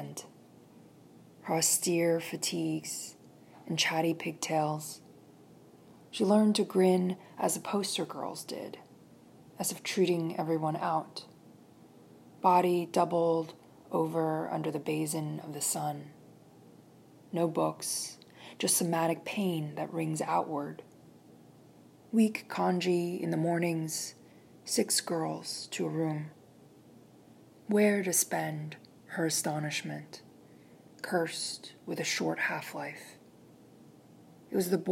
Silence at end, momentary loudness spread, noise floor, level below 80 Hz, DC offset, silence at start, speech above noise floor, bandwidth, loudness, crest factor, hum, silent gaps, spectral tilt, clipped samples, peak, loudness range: 0 s; 17 LU; -57 dBFS; -84 dBFS; under 0.1%; 0 s; 26 dB; 16 kHz; -31 LUFS; 20 dB; none; none; -4 dB/octave; under 0.1%; -12 dBFS; 5 LU